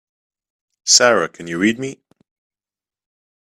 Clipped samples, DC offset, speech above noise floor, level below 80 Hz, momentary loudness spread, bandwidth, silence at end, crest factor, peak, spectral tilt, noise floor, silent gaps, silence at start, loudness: under 0.1%; under 0.1%; over 74 dB; -64 dBFS; 16 LU; 15.5 kHz; 1.5 s; 20 dB; 0 dBFS; -1.5 dB/octave; under -90 dBFS; none; 0.85 s; -15 LUFS